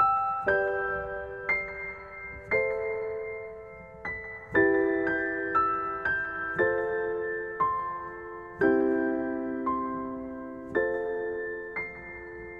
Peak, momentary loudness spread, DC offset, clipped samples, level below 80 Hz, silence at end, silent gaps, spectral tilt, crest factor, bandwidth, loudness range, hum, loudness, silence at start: -12 dBFS; 14 LU; under 0.1%; under 0.1%; -56 dBFS; 0 s; none; -8 dB/octave; 18 dB; 5.2 kHz; 5 LU; none; -29 LUFS; 0 s